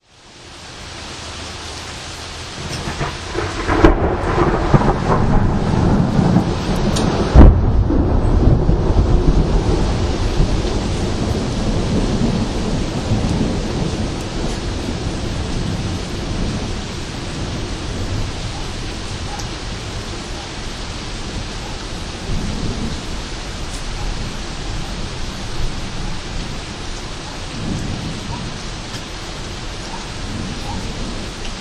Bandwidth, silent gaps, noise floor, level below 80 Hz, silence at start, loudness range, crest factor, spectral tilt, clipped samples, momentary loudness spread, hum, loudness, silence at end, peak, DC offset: 12 kHz; none; -41 dBFS; -22 dBFS; 0.25 s; 12 LU; 18 dB; -6 dB/octave; under 0.1%; 13 LU; none; -20 LUFS; 0 s; 0 dBFS; under 0.1%